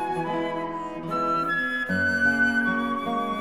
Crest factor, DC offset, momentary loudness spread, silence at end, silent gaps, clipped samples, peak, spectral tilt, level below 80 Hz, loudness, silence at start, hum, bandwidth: 14 dB; 0.3%; 9 LU; 0 s; none; under 0.1%; -12 dBFS; -5.5 dB/octave; -60 dBFS; -25 LUFS; 0 s; none; 15.5 kHz